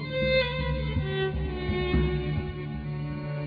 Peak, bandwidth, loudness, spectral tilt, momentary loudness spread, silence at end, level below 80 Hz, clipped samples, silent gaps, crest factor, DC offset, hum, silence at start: -14 dBFS; 5 kHz; -29 LUFS; -9 dB/octave; 9 LU; 0 s; -36 dBFS; under 0.1%; none; 14 dB; under 0.1%; none; 0 s